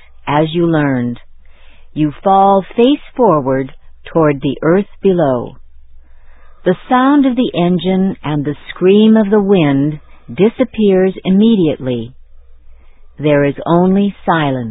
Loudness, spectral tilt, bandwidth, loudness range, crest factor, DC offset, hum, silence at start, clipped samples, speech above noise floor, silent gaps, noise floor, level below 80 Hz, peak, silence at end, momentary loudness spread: -13 LUFS; -11.5 dB/octave; 4 kHz; 3 LU; 14 dB; under 0.1%; none; 0.25 s; under 0.1%; 24 dB; none; -36 dBFS; -42 dBFS; 0 dBFS; 0 s; 10 LU